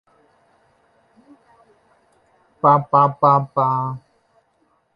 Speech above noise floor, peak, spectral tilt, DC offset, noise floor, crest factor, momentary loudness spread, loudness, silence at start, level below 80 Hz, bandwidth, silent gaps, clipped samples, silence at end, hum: 48 dB; -2 dBFS; -10 dB/octave; under 0.1%; -64 dBFS; 20 dB; 11 LU; -17 LUFS; 2.65 s; -66 dBFS; 5.4 kHz; none; under 0.1%; 1 s; none